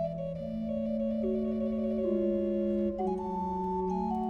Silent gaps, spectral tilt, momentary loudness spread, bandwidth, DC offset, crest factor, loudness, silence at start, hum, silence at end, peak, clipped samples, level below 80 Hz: none; -10 dB/octave; 5 LU; 6.6 kHz; under 0.1%; 12 dB; -32 LUFS; 0 s; none; 0 s; -18 dBFS; under 0.1%; -52 dBFS